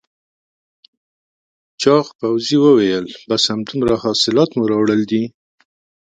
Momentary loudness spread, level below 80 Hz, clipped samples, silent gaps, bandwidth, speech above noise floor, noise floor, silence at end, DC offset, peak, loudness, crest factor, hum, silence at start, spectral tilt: 9 LU; -54 dBFS; under 0.1%; 2.15-2.19 s; 9.2 kHz; over 75 dB; under -90 dBFS; 0.8 s; under 0.1%; 0 dBFS; -16 LUFS; 18 dB; none; 1.8 s; -5 dB/octave